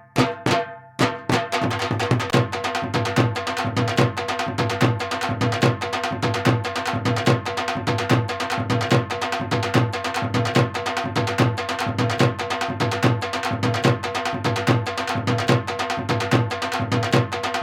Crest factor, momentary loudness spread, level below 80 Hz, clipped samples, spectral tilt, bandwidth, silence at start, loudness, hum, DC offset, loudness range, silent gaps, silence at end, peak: 20 dB; 5 LU; -54 dBFS; under 0.1%; -5.5 dB/octave; 16 kHz; 0.15 s; -22 LUFS; none; under 0.1%; 0 LU; none; 0 s; -2 dBFS